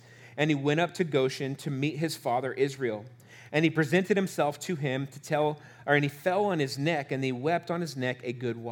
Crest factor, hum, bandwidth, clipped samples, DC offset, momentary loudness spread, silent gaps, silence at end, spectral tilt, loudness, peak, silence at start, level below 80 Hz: 18 dB; none; 19 kHz; under 0.1%; under 0.1%; 8 LU; none; 0 s; -6 dB/octave; -29 LUFS; -10 dBFS; 0.1 s; -78 dBFS